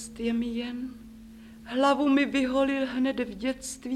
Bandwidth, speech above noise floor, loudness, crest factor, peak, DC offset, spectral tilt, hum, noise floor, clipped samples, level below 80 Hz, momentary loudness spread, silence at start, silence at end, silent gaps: 13.5 kHz; 20 dB; -27 LUFS; 16 dB; -10 dBFS; under 0.1%; -4 dB/octave; none; -47 dBFS; under 0.1%; -54 dBFS; 21 LU; 0 s; 0 s; none